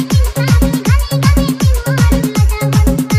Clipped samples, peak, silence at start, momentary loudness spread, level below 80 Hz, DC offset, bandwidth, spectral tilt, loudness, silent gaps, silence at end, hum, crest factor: under 0.1%; 0 dBFS; 0 s; 2 LU; -16 dBFS; under 0.1%; 16 kHz; -6 dB/octave; -13 LUFS; none; 0 s; none; 10 dB